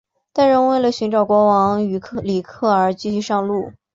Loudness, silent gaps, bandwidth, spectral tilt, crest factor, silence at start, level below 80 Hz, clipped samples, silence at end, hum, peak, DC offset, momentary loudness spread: -18 LUFS; none; 7.8 kHz; -6.5 dB/octave; 14 dB; 0.35 s; -54 dBFS; under 0.1%; 0.25 s; none; -4 dBFS; under 0.1%; 9 LU